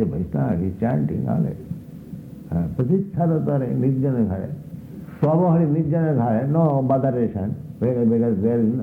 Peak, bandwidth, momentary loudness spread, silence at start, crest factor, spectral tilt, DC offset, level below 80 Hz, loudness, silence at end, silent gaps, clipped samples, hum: -6 dBFS; 3.4 kHz; 16 LU; 0 s; 14 dB; -12 dB/octave; under 0.1%; -48 dBFS; -21 LUFS; 0 s; none; under 0.1%; none